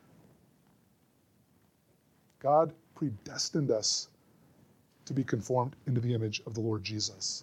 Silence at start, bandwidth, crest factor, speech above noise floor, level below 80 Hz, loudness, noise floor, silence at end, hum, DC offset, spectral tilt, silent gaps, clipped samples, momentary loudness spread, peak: 2.45 s; 12.5 kHz; 20 dB; 37 dB; -72 dBFS; -32 LUFS; -68 dBFS; 0 s; none; under 0.1%; -4.5 dB/octave; none; under 0.1%; 10 LU; -14 dBFS